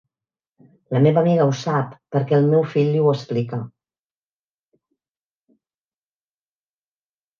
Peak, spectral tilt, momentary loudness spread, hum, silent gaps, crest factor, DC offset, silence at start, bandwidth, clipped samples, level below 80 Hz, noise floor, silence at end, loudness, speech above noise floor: -4 dBFS; -8 dB/octave; 9 LU; none; none; 18 dB; under 0.1%; 0.9 s; 7 kHz; under 0.1%; -68 dBFS; under -90 dBFS; 3.7 s; -19 LUFS; over 72 dB